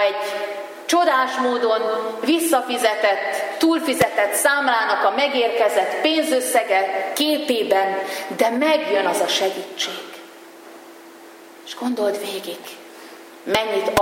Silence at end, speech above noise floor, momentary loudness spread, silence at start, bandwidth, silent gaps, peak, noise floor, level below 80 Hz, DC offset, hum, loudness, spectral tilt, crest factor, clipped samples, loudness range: 0 s; 23 dB; 13 LU; 0 s; 16.5 kHz; none; -2 dBFS; -42 dBFS; -64 dBFS; under 0.1%; none; -20 LUFS; -2.5 dB/octave; 20 dB; under 0.1%; 9 LU